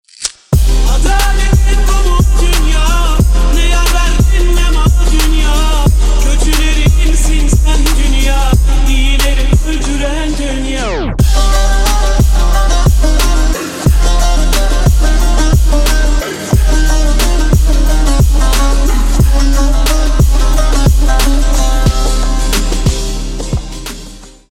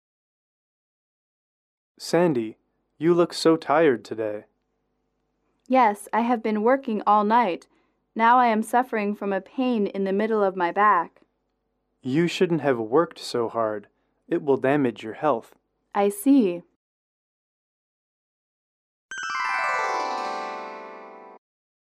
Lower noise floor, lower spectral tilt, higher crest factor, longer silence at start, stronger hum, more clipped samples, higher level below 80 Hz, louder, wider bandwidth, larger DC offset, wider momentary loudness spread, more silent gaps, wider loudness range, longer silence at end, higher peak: second, -31 dBFS vs -75 dBFS; about the same, -4.5 dB/octave vs -5.5 dB/octave; second, 8 dB vs 18 dB; second, 0.2 s vs 2 s; neither; neither; first, -10 dBFS vs -74 dBFS; first, -12 LUFS vs -23 LUFS; about the same, 15 kHz vs 15 kHz; neither; second, 5 LU vs 15 LU; second, none vs 16.76-19.09 s; second, 2 LU vs 7 LU; second, 0.25 s vs 0.5 s; first, 0 dBFS vs -8 dBFS